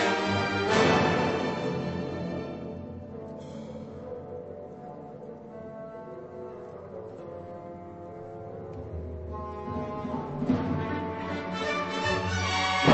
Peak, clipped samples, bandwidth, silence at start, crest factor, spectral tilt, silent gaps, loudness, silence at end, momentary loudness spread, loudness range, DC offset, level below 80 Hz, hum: -6 dBFS; under 0.1%; 8.4 kHz; 0 s; 24 dB; -5.5 dB/octave; none; -30 LUFS; 0 s; 17 LU; 14 LU; under 0.1%; -52 dBFS; none